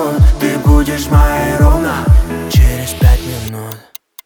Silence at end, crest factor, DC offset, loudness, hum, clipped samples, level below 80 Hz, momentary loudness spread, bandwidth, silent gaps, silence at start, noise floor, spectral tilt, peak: 0.45 s; 10 dB; under 0.1%; -12 LUFS; none; under 0.1%; -14 dBFS; 13 LU; 20 kHz; none; 0 s; -36 dBFS; -6 dB/octave; 0 dBFS